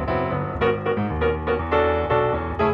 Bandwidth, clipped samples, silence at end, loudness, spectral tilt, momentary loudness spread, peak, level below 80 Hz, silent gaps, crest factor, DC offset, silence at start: 5.8 kHz; under 0.1%; 0 s; -22 LUFS; -9 dB/octave; 4 LU; -8 dBFS; -36 dBFS; none; 14 dB; under 0.1%; 0 s